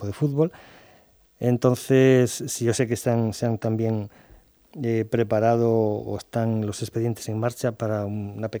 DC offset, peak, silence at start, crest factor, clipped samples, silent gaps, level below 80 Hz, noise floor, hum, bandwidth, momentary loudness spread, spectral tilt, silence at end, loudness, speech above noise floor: under 0.1%; -6 dBFS; 0 s; 18 dB; under 0.1%; none; -60 dBFS; -56 dBFS; none; over 20 kHz; 10 LU; -6.5 dB/octave; 0 s; -24 LUFS; 33 dB